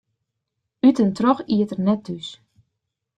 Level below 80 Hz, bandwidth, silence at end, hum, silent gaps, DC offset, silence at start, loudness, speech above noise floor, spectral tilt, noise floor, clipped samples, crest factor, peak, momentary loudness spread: -62 dBFS; 9.2 kHz; 0.85 s; none; none; under 0.1%; 0.85 s; -20 LUFS; 60 dB; -7.5 dB/octave; -79 dBFS; under 0.1%; 18 dB; -4 dBFS; 15 LU